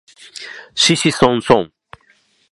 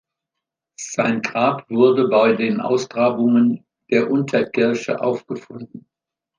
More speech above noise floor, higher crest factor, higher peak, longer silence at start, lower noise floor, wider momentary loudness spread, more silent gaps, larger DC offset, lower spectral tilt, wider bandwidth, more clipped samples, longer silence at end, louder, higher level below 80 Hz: second, 42 dB vs 65 dB; about the same, 18 dB vs 16 dB; about the same, 0 dBFS vs -2 dBFS; second, 0.4 s vs 0.8 s; second, -57 dBFS vs -83 dBFS; first, 19 LU vs 15 LU; neither; neither; second, -3.5 dB/octave vs -5.5 dB/octave; first, 11.5 kHz vs 9.4 kHz; neither; first, 0.85 s vs 0.6 s; first, -14 LUFS vs -18 LUFS; first, -50 dBFS vs -68 dBFS